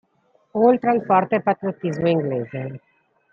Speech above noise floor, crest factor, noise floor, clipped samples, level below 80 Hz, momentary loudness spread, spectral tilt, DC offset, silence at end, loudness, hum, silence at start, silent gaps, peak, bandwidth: 43 dB; 18 dB; -63 dBFS; under 0.1%; -62 dBFS; 14 LU; -8.5 dB/octave; under 0.1%; 0.55 s; -21 LUFS; none; 0.55 s; none; -4 dBFS; 7 kHz